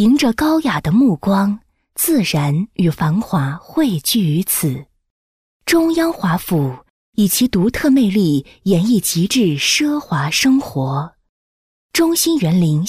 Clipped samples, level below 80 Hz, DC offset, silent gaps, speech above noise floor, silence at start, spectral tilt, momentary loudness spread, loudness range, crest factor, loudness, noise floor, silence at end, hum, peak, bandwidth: under 0.1%; -46 dBFS; under 0.1%; 5.10-5.60 s, 6.90-7.13 s, 11.29-11.89 s; over 75 dB; 0 s; -5 dB/octave; 7 LU; 3 LU; 12 dB; -16 LUFS; under -90 dBFS; 0 s; none; -4 dBFS; 15.5 kHz